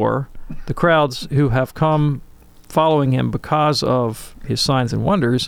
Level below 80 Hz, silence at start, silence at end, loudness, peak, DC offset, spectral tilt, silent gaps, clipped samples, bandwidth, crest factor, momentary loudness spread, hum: -38 dBFS; 0 s; 0 s; -18 LUFS; -2 dBFS; under 0.1%; -6 dB/octave; none; under 0.1%; 16 kHz; 16 dB; 10 LU; none